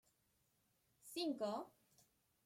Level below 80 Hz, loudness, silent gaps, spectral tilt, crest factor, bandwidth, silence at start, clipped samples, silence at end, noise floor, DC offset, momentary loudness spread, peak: -90 dBFS; -45 LUFS; none; -4 dB/octave; 18 dB; 16.5 kHz; 1.05 s; under 0.1%; 0.75 s; -81 dBFS; under 0.1%; 17 LU; -32 dBFS